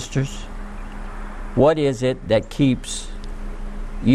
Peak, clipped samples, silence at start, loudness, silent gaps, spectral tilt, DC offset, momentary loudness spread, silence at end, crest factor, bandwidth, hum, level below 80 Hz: -4 dBFS; under 0.1%; 0 s; -21 LUFS; none; -6 dB/octave; under 0.1%; 18 LU; 0 s; 18 dB; 13 kHz; none; -32 dBFS